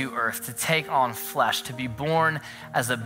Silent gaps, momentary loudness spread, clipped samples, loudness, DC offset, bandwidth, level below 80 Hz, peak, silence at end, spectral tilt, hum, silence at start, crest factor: none; 7 LU; under 0.1%; -25 LUFS; under 0.1%; 16.5 kHz; -60 dBFS; -6 dBFS; 0 s; -3.5 dB/octave; none; 0 s; 20 dB